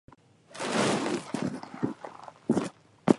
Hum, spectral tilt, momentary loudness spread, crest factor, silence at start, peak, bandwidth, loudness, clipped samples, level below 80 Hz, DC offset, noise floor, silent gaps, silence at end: none; -5 dB/octave; 14 LU; 26 dB; 0.5 s; -4 dBFS; 11.5 kHz; -31 LUFS; under 0.1%; -68 dBFS; under 0.1%; -52 dBFS; none; 0 s